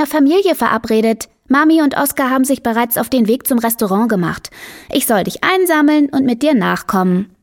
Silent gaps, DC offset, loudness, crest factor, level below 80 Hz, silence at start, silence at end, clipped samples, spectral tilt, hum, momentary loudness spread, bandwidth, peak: none; under 0.1%; -14 LUFS; 14 dB; -50 dBFS; 0 s; 0.15 s; under 0.1%; -5 dB/octave; none; 6 LU; 17.5 kHz; 0 dBFS